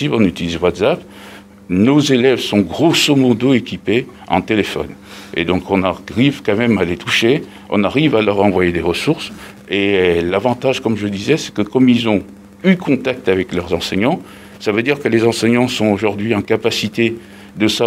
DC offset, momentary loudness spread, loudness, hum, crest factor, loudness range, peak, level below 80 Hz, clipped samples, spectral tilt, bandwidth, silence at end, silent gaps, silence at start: under 0.1%; 8 LU; -15 LUFS; none; 16 dB; 3 LU; 0 dBFS; -46 dBFS; under 0.1%; -5.5 dB/octave; 16 kHz; 0 s; none; 0 s